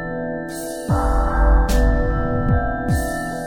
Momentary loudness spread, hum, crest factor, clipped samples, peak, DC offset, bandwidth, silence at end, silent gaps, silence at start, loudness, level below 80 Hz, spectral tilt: 9 LU; none; 14 dB; under 0.1%; -4 dBFS; under 0.1%; 19 kHz; 0 s; none; 0 s; -21 LUFS; -20 dBFS; -6.5 dB/octave